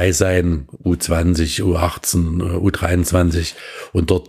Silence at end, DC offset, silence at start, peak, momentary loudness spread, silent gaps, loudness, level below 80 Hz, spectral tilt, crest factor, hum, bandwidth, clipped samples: 0 s; under 0.1%; 0 s; 0 dBFS; 7 LU; none; -18 LUFS; -30 dBFS; -5 dB/octave; 16 dB; none; 15.5 kHz; under 0.1%